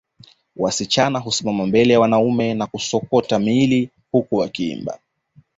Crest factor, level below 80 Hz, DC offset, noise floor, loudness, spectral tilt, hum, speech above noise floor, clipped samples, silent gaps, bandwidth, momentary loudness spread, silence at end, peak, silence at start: 16 dB; -54 dBFS; under 0.1%; -55 dBFS; -19 LUFS; -5 dB/octave; none; 37 dB; under 0.1%; none; 8 kHz; 10 LU; 0.6 s; -2 dBFS; 0.55 s